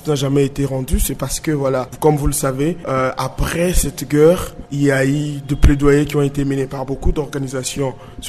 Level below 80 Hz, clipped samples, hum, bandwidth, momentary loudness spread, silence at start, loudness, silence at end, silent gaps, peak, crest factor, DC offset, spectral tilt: -24 dBFS; under 0.1%; none; 13.5 kHz; 9 LU; 0 s; -18 LUFS; 0 s; none; -2 dBFS; 16 dB; under 0.1%; -5.5 dB/octave